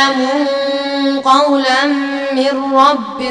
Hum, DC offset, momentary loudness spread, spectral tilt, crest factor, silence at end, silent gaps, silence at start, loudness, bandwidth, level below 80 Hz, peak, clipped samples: none; 0.2%; 6 LU; -2.5 dB/octave; 14 dB; 0 s; none; 0 s; -13 LUFS; 10.5 kHz; -60 dBFS; 0 dBFS; under 0.1%